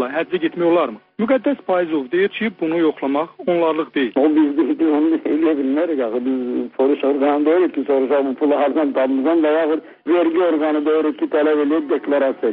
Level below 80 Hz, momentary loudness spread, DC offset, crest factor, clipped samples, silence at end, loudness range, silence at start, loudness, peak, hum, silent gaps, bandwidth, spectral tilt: -66 dBFS; 5 LU; under 0.1%; 12 dB; under 0.1%; 0 s; 2 LU; 0 s; -18 LUFS; -6 dBFS; none; none; 4.2 kHz; -4 dB/octave